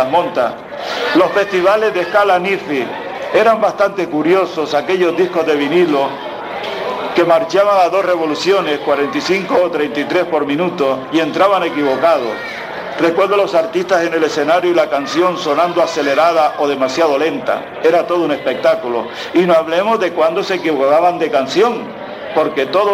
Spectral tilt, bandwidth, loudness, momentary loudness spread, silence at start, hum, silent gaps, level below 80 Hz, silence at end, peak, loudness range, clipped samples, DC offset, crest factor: -5 dB/octave; 15 kHz; -14 LUFS; 8 LU; 0 s; none; none; -58 dBFS; 0 s; 0 dBFS; 1 LU; under 0.1%; under 0.1%; 14 dB